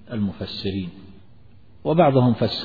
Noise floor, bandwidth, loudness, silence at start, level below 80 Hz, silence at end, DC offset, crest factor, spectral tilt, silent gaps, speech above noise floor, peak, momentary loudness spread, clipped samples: -51 dBFS; 4.9 kHz; -21 LUFS; 0.1 s; -52 dBFS; 0 s; 0.5%; 18 dB; -9 dB/octave; none; 31 dB; -4 dBFS; 14 LU; under 0.1%